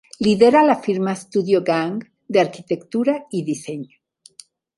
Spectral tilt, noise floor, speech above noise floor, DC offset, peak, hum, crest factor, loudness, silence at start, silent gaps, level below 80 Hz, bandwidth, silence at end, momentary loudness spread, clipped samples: -6 dB/octave; -49 dBFS; 30 dB; under 0.1%; 0 dBFS; none; 20 dB; -19 LUFS; 0.2 s; none; -62 dBFS; 11.5 kHz; 0.95 s; 15 LU; under 0.1%